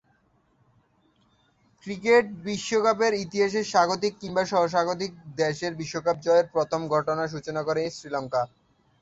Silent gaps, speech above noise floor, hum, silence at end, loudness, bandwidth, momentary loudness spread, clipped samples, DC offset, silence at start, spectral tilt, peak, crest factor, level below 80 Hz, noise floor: none; 41 dB; none; 0.55 s; -25 LUFS; 8 kHz; 10 LU; under 0.1%; under 0.1%; 1.85 s; -4.5 dB/octave; -8 dBFS; 18 dB; -64 dBFS; -66 dBFS